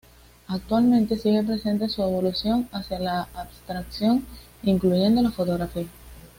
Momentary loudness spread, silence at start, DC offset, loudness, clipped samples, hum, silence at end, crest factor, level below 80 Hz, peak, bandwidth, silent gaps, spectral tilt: 14 LU; 0.5 s; under 0.1%; -24 LUFS; under 0.1%; none; 0.1 s; 14 dB; -46 dBFS; -10 dBFS; 16.5 kHz; none; -7 dB/octave